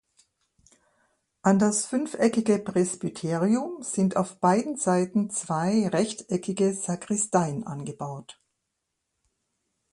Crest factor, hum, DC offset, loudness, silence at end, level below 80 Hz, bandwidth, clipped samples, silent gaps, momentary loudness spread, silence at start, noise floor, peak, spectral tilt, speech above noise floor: 20 dB; none; under 0.1%; -26 LUFS; 1.6 s; -68 dBFS; 11.5 kHz; under 0.1%; none; 8 LU; 1.45 s; -81 dBFS; -6 dBFS; -5.5 dB/octave; 56 dB